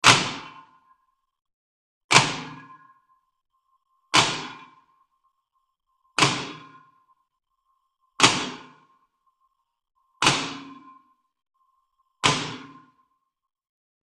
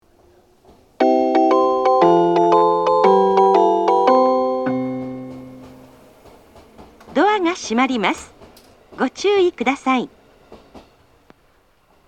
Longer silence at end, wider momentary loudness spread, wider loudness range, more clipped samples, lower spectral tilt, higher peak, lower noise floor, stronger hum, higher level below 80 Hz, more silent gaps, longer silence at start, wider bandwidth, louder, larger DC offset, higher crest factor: about the same, 1.4 s vs 1.3 s; first, 23 LU vs 12 LU; about the same, 6 LU vs 8 LU; neither; second, -2 dB/octave vs -5.5 dB/octave; about the same, 0 dBFS vs 0 dBFS; first, -75 dBFS vs -57 dBFS; neither; about the same, -60 dBFS vs -58 dBFS; first, 1.53-2.09 s vs none; second, 0.05 s vs 1 s; first, 13 kHz vs 9.2 kHz; second, -22 LUFS vs -16 LUFS; neither; first, 28 dB vs 18 dB